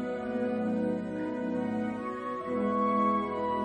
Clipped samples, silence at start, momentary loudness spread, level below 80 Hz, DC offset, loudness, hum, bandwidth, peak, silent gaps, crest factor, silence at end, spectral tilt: under 0.1%; 0 s; 7 LU; -64 dBFS; under 0.1%; -31 LUFS; none; 9.2 kHz; -16 dBFS; none; 14 dB; 0 s; -8 dB/octave